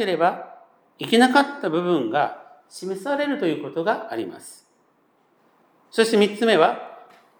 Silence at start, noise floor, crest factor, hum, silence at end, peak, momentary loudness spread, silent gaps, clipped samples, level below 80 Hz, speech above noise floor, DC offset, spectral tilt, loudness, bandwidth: 0 s; -63 dBFS; 20 dB; none; 0.4 s; -2 dBFS; 21 LU; none; under 0.1%; -82 dBFS; 42 dB; under 0.1%; -4.5 dB/octave; -21 LUFS; over 20 kHz